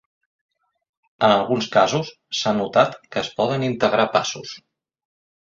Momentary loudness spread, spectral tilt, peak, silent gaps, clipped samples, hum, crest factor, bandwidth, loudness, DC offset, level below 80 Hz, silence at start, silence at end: 10 LU; -4.5 dB/octave; -2 dBFS; none; under 0.1%; none; 20 dB; 7.8 kHz; -20 LUFS; under 0.1%; -60 dBFS; 1.2 s; 0.9 s